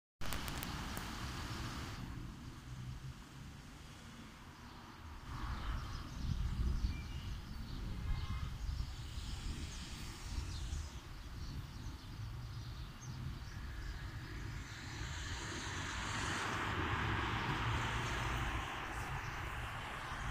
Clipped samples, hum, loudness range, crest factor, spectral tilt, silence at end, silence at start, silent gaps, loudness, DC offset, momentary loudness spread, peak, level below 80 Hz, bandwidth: under 0.1%; none; 10 LU; 26 dB; -4.5 dB/octave; 0 s; 0.2 s; none; -43 LUFS; under 0.1%; 14 LU; -16 dBFS; -48 dBFS; 15.5 kHz